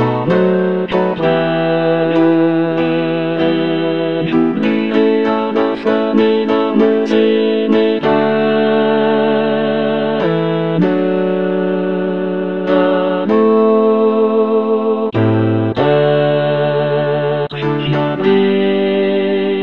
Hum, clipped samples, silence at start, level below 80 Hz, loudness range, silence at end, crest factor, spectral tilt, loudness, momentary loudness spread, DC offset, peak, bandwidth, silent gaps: none; under 0.1%; 0 s; -54 dBFS; 2 LU; 0 s; 12 dB; -8.5 dB/octave; -14 LUFS; 4 LU; 0.8%; 0 dBFS; 6.2 kHz; none